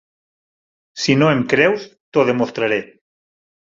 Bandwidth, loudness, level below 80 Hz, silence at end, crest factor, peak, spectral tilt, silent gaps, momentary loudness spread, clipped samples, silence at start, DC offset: 7.8 kHz; -17 LUFS; -58 dBFS; 0.85 s; 18 dB; 0 dBFS; -5.5 dB/octave; 2.00-2.12 s; 9 LU; under 0.1%; 0.95 s; under 0.1%